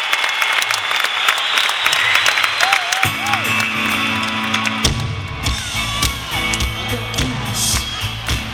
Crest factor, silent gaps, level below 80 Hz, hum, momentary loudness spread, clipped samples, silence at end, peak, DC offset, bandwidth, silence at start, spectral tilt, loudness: 18 dB; none; -32 dBFS; none; 7 LU; under 0.1%; 0 s; 0 dBFS; under 0.1%; 19.5 kHz; 0 s; -2 dB/octave; -16 LUFS